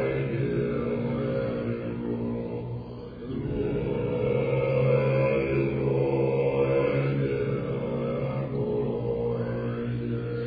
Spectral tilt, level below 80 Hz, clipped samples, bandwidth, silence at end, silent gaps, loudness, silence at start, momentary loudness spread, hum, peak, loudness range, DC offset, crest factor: -11 dB/octave; -48 dBFS; under 0.1%; 5 kHz; 0 s; none; -28 LUFS; 0 s; 8 LU; none; -12 dBFS; 6 LU; under 0.1%; 14 dB